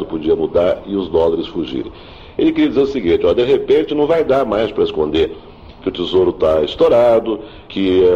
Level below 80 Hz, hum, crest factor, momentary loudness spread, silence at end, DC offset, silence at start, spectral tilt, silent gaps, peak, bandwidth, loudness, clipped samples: -40 dBFS; none; 12 dB; 11 LU; 0 s; 0.1%; 0 s; -7.5 dB/octave; none; -2 dBFS; 7.2 kHz; -16 LUFS; under 0.1%